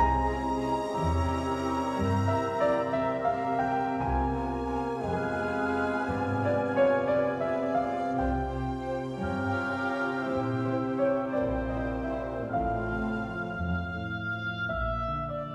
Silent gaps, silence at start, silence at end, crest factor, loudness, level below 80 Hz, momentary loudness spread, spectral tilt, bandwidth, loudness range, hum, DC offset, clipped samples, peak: none; 0 s; 0 s; 16 dB; -29 LUFS; -42 dBFS; 6 LU; -7.5 dB/octave; 11.5 kHz; 3 LU; none; under 0.1%; under 0.1%; -12 dBFS